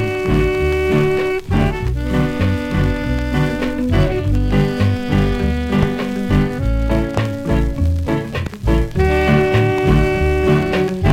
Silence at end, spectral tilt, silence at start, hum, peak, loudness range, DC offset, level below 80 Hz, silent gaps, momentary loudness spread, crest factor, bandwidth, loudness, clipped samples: 0 s; -7.5 dB/octave; 0 s; none; 0 dBFS; 2 LU; under 0.1%; -22 dBFS; none; 5 LU; 16 dB; 16 kHz; -17 LUFS; under 0.1%